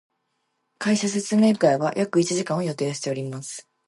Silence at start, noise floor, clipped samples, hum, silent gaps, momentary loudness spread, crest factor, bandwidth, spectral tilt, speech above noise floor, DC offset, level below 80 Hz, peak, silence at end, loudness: 0.8 s; -74 dBFS; under 0.1%; none; none; 11 LU; 18 dB; 11.5 kHz; -5 dB/octave; 52 dB; under 0.1%; -72 dBFS; -6 dBFS; 0.25 s; -23 LUFS